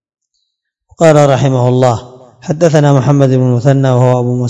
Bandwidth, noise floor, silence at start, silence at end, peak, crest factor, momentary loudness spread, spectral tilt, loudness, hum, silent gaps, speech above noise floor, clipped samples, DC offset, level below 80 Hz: 8.8 kHz; -69 dBFS; 1 s; 0 s; 0 dBFS; 10 dB; 5 LU; -7.5 dB/octave; -10 LUFS; none; none; 60 dB; 1%; under 0.1%; -48 dBFS